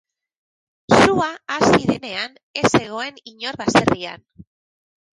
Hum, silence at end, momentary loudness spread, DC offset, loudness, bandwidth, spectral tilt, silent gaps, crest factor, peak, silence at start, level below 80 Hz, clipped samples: none; 0.7 s; 14 LU; under 0.1%; -19 LUFS; 11.5 kHz; -4.5 dB/octave; 2.43-2.54 s; 18 dB; -2 dBFS; 0.9 s; -48 dBFS; under 0.1%